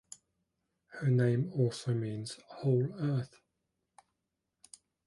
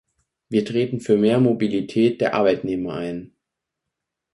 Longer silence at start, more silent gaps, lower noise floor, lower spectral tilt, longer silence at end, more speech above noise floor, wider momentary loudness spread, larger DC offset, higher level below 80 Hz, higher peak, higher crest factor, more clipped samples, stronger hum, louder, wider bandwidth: first, 0.9 s vs 0.5 s; neither; about the same, -85 dBFS vs -82 dBFS; about the same, -7.5 dB/octave vs -7.5 dB/octave; first, 1.8 s vs 1.05 s; second, 54 dB vs 62 dB; first, 19 LU vs 10 LU; neither; second, -72 dBFS vs -58 dBFS; second, -18 dBFS vs -4 dBFS; about the same, 16 dB vs 16 dB; neither; neither; second, -33 LUFS vs -21 LUFS; about the same, 11.5 kHz vs 11.5 kHz